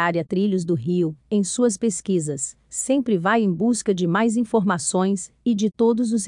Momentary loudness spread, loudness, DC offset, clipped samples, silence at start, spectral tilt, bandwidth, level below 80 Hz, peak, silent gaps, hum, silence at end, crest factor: 4 LU; -22 LUFS; under 0.1%; under 0.1%; 0 s; -5.5 dB/octave; 11 kHz; -62 dBFS; -6 dBFS; none; none; 0 s; 14 dB